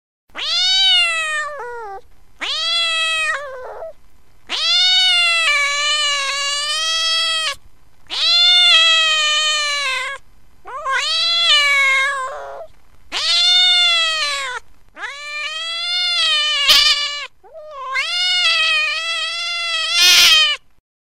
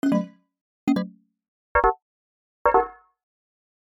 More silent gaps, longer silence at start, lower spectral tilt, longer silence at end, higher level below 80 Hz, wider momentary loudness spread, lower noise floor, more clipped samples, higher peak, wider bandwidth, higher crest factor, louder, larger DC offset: second, none vs 0.61-0.87 s, 1.48-1.75 s, 2.02-2.65 s; first, 0.35 s vs 0.05 s; second, 3 dB/octave vs -7.5 dB/octave; second, 0.6 s vs 1.05 s; second, -52 dBFS vs -44 dBFS; first, 19 LU vs 16 LU; second, -49 dBFS vs under -90 dBFS; neither; first, 0 dBFS vs -6 dBFS; about the same, 16 kHz vs 16.5 kHz; about the same, 18 dB vs 20 dB; first, -13 LUFS vs -24 LUFS; first, 1% vs under 0.1%